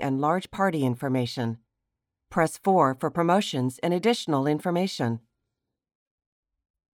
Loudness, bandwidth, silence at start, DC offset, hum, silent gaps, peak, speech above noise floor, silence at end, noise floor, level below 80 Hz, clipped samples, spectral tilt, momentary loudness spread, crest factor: -26 LUFS; 17.5 kHz; 0 s; under 0.1%; none; none; -8 dBFS; 59 dB; 1.75 s; -84 dBFS; -66 dBFS; under 0.1%; -6 dB/octave; 8 LU; 18 dB